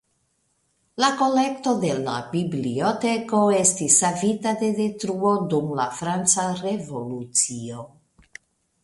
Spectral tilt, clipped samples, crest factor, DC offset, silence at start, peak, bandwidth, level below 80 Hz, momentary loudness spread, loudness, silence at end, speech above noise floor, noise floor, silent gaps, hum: -3.5 dB/octave; under 0.1%; 20 dB; under 0.1%; 0.95 s; -4 dBFS; 11.5 kHz; -64 dBFS; 11 LU; -22 LUFS; 0.95 s; 47 dB; -70 dBFS; none; none